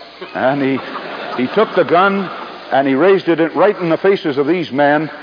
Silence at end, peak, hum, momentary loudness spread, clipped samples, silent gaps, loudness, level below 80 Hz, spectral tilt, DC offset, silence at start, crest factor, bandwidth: 0 s; 0 dBFS; none; 12 LU; under 0.1%; none; -15 LUFS; -64 dBFS; -8 dB/octave; under 0.1%; 0 s; 14 dB; 5.2 kHz